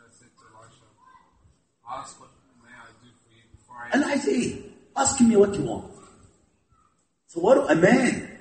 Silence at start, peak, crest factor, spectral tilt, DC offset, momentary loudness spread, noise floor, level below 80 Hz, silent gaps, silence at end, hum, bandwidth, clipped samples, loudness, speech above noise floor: 1.85 s; -4 dBFS; 22 dB; -4.5 dB/octave; under 0.1%; 21 LU; -67 dBFS; -58 dBFS; none; 0.05 s; none; 8.8 kHz; under 0.1%; -22 LUFS; 45 dB